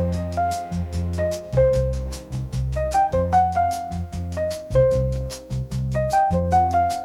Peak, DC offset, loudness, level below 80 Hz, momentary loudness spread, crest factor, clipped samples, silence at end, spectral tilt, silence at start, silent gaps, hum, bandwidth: -6 dBFS; under 0.1%; -22 LUFS; -34 dBFS; 10 LU; 16 dB; under 0.1%; 0 s; -7 dB/octave; 0 s; none; none; 15.5 kHz